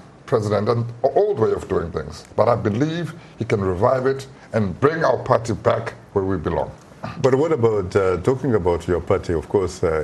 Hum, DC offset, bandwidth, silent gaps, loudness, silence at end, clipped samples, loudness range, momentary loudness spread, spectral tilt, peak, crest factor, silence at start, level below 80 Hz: none; under 0.1%; 12 kHz; none; -21 LUFS; 0 s; under 0.1%; 1 LU; 9 LU; -7 dB/octave; -2 dBFS; 20 dB; 0.05 s; -44 dBFS